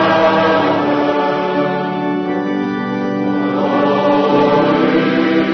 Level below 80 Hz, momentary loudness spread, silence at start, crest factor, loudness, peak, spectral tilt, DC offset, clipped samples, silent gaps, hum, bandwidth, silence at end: -52 dBFS; 6 LU; 0 s; 12 dB; -15 LUFS; -2 dBFS; -7.5 dB/octave; under 0.1%; under 0.1%; none; none; 6.2 kHz; 0 s